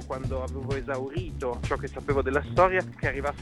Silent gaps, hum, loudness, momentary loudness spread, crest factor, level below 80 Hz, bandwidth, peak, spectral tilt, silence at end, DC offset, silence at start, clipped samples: none; none; -28 LUFS; 10 LU; 20 dB; -40 dBFS; 12 kHz; -8 dBFS; -6.5 dB/octave; 0 s; under 0.1%; 0 s; under 0.1%